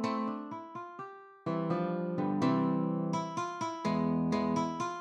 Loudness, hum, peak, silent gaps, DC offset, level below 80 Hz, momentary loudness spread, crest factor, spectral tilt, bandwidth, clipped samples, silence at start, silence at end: -33 LUFS; none; -16 dBFS; none; under 0.1%; -68 dBFS; 13 LU; 16 dB; -7 dB/octave; 9.6 kHz; under 0.1%; 0 s; 0 s